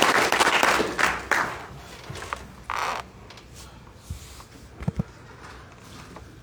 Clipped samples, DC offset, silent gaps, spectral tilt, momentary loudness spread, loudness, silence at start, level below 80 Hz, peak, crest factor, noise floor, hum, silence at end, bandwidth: under 0.1%; under 0.1%; none; -3 dB/octave; 25 LU; -24 LUFS; 0 s; -48 dBFS; 0 dBFS; 28 dB; -45 dBFS; none; 0 s; over 20 kHz